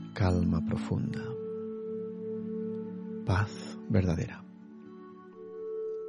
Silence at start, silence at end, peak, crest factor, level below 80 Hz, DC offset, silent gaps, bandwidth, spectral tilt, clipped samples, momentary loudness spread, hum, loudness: 0 s; 0 s; -14 dBFS; 20 dB; -52 dBFS; under 0.1%; none; 10.5 kHz; -8 dB/octave; under 0.1%; 20 LU; none; -33 LUFS